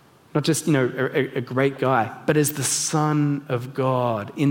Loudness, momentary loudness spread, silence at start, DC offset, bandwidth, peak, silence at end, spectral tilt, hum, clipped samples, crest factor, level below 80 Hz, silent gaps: -22 LUFS; 5 LU; 0.35 s; under 0.1%; 17 kHz; -4 dBFS; 0 s; -5 dB/octave; none; under 0.1%; 18 dB; -66 dBFS; none